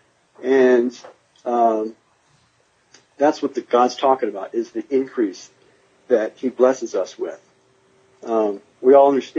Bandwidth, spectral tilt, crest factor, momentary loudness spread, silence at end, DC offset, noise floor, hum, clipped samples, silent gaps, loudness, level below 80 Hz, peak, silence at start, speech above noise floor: 7.6 kHz; -5 dB/octave; 18 dB; 14 LU; 0 s; under 0.1%; -61 dBFS; none; under 0.1%; none; -19 LUFS; -80 dBFS; -2 dBFS; 0.4 s; 43 dB